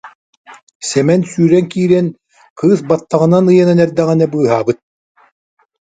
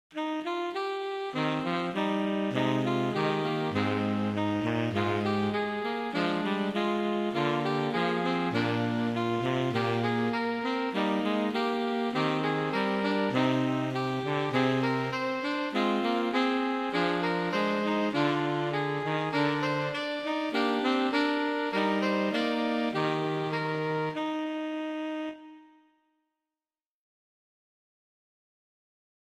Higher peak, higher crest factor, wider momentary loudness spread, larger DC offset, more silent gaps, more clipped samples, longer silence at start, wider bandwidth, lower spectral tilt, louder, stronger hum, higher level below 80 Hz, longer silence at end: first, 0 dBFS vs -12 dBFS; about the same, 14 dB vs 18 dB; first, 9 LU vs 5 LU; neither; first, 0.15-0.44 s, 0.62-0.67 s, 0.75-0.80 s, 2.50-2.56 s vs none; neither; about the same, 0.05 s vs 0.1 s; second, 9.4 kHz vs 13.5 kHz; about the same, -7 dB/octave vs -6.5 dB/octave; first, -13 LUFS vs -29 LUFS; neither; first, -56 dBFS vs -70 dBFS; second, 1.2 s vs 3.6 s